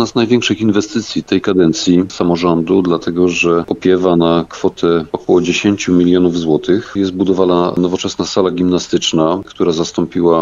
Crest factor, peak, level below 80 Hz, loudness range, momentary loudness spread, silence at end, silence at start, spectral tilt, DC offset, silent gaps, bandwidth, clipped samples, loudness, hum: 12 dB; 0 dBFS; -46 dBFS; 1 LU; 5 LU; 0 s; 0 s; -5.5 dB/octave; under 0.1%; none; 7.6 kHz; under 0.1%; -14 LUFS; none